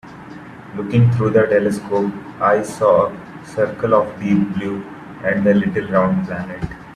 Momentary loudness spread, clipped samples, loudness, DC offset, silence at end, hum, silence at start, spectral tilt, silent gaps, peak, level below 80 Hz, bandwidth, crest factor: 16 LU; under 0.1%; -18 LUFS; under 0.1%; 0 s; none; 0.05 s; -8 dB/octave; none; 0 dBFS; -48 dBFS; 12.5 kHz; 18 dB